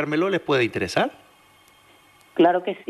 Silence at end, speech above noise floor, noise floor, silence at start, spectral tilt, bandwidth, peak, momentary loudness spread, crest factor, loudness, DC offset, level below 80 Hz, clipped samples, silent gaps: 0.05 s; 33 dB; -55 dBFS; 0 s; -5.5 dB/octave; 13 kHz; -6 dBFS; 7 LU; 18 dB; -22 LUFS; under 0.1%; -62 dBFS; under 0.1%; none